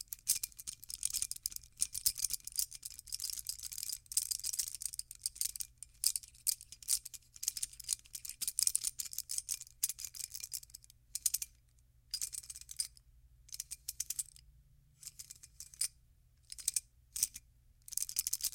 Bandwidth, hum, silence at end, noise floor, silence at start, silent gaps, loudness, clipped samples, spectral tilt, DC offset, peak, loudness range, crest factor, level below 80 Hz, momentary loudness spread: 17 kHz; none; 0 s; -67 dBFS; 0 s; none; -38 LUFS; under 0.1%; 2.5 dB/octave; under 0.1%; -10 dBFS; 7 LU; 32 dB; -66 dBFS; 13 LU